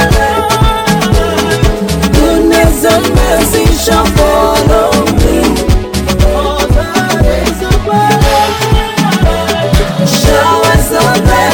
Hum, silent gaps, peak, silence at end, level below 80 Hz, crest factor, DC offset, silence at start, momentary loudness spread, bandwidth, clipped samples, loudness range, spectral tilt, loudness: none; none; 0 dBFS; 0 s; -14 dBFS; 8 dB; under 0.1%; 0 s; 4 LU; 18 kHz; 0.1%; 2 LU; -5 dB/octave; -9 LUFS